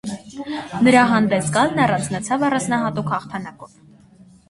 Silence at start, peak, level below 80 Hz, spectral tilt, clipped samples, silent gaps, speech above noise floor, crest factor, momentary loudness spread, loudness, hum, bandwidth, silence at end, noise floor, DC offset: 0.05 s; 0 dBFS; -54 dBFS; -5 dB/octave; under 0.1%; none; 30 dB; 20 dB; 17 LU; -19 LUFS; none; 11.5 kHz; 0.85 s; -48 dBFS; under 0.1%